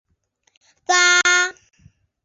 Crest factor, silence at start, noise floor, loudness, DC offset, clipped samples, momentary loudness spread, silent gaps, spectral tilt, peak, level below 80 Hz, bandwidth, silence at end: 20 dB; 0.9 s; -67 dBFS; -15 LUFS; under 0.1%; under 0.1%; 13 LU; none; 1.5 dB/octave; -2 dBFS; -66 dBFS; 7.8 kHz; 0.75 s